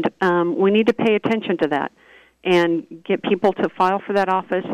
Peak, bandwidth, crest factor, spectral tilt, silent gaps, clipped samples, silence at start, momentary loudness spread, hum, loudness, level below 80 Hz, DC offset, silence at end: -6 dBFS; 10.5 kHz; 12 dB; -7 dB/octave; none; under 0.1%; 0 s; 7 LU; none; -19 LUFS; -64 dBFS; under 0.1%; 0 s